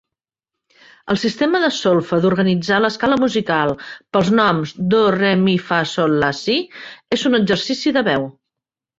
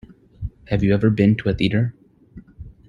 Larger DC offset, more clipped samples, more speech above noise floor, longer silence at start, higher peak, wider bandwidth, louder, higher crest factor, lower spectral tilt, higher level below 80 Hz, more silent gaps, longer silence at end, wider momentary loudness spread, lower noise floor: neither; neither; first, 68 dB vs 27 dB; first, 1.05 s vs 0.1 s; about the same, -2 dBFS vs -4 dBFS; first, 7.8 kHz vs 7 kHz; about the same, -17 LUFS vs -19 LUFS; about the same, 16 dB vs 18 dB; second, -5.5 dB/octave vs -9 dB/octave; second, -54 dBFS vs -40 dBFS; neither; first, 0.7 s vs 0.15 s; second, 7 LU vs 18 LU; first, -85 dBFS vs -45 dBFS